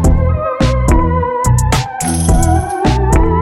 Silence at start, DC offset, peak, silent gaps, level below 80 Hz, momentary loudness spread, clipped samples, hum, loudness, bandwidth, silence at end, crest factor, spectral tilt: 0 s; under 0.1%; 0 dBFS; none; -16 dBFS; 3 LU; under 0.1%; none; -13 LUFS; 15.5 kHz; 0 s; 12 dB; -6 dB/octave